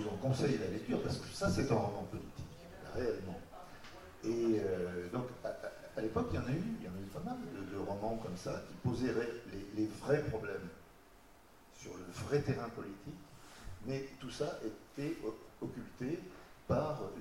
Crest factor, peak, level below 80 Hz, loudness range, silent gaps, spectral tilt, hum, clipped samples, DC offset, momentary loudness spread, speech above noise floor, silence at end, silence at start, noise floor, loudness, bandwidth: 20 dB; -20 dBFS; -58 dBFS; 5 LU; none; -6.5 dB/octave; none; under 0.1%; under 0.1%; 17 LU; 24 dB; 0 s; 0 s; -62 dBFS; -39 LUFS; 16 kHz